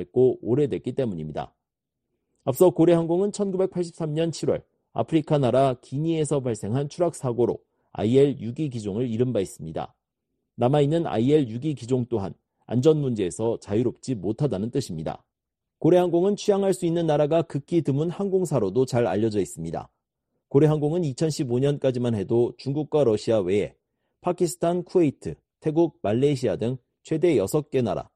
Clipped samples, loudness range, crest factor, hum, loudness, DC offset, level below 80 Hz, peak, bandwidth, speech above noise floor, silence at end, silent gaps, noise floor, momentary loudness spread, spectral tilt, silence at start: under 0.1%; 2 LU; 18 dB; none; -24 LUFS; under 0.1%; -58 dBFS; -6 dBFS; 12.5 kHz; 62 dB; 0.15 s; none; -85 dBFS; 11 LU; -7 dB/octave; 0 s